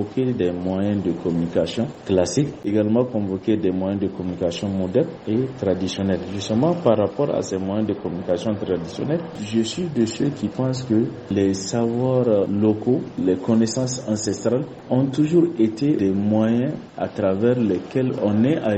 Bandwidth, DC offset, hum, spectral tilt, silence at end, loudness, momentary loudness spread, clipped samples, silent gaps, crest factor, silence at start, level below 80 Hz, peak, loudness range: 8.6 kHz; under 0.1%; none; -6.5 dB/octave; 0 s; -22 LUFS; 6 LU; under 0.1%; none; 18 dB; 0 s; -54 dBFS; -4 dBFS; 3 LU